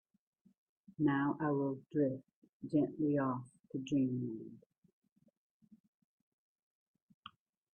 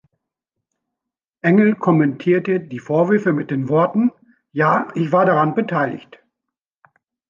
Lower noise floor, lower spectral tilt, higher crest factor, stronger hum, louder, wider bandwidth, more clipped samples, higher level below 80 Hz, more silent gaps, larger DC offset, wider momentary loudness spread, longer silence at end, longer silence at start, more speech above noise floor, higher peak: second, -60 dBFS vs -84 dBFS; about the same, -8.5 dB/octave vs -9 dB/octave; about the same, 18 dB vs 16 dB; neither; second, -36 LUFS vs -18 LUFS; first, 8.6 kHz vs 7.2 kHz; neither; second, -78 dBFS vs -66 dBFS; first, 2.35-2.42 s, 2.49-2.60 s, 3.60-3.64 s vs none; neither; first, 21 LU vs 8 LU; first, 3.2 s vs 1.3 s; second, 1 s vs 1.45 s; second, 25 dB vs 67 dB; second, -22 dBFS vs -4 dBFS